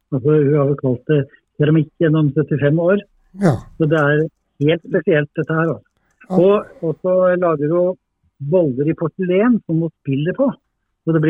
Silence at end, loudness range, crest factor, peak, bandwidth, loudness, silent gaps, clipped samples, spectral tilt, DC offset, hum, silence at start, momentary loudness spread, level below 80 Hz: 0 s; 2 LU; 16 dB; -2 dBFS; 6.8 kHz; -17 LUFS; none; under 0.1%; -9.5 dB/octave; under 0.1%; none; 0.1 s; 7 LU; -54 dBFS